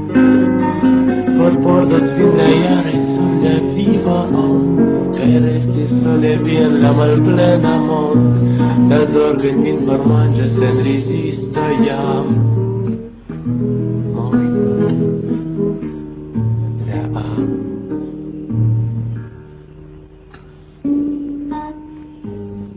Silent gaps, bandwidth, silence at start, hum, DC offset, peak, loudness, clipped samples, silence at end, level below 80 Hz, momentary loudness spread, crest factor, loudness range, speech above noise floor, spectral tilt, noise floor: none; 4 kHz; 0 s; none; under 0.1%; 0 dBFS; -14 LUFS; under 0.1%; 0 s; -40 dBFS; 13 LU; 14 dB; 10 LU; 27 dB; -12.5 dB/octave; -39 dBFS